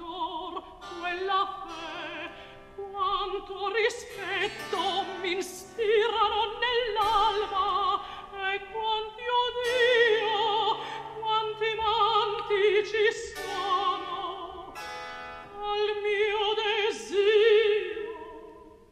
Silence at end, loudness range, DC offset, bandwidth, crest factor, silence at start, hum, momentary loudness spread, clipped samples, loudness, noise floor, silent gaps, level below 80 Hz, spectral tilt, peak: 0.2 s; 6 LU; under 0.1%; 14 kHz; 16 dB; 0 s; none; 15 LU; under 0.1%; -27 LUFS; -49 dBFS; none; -56 dBFS; -2.5 dB/octave; -12 dBFS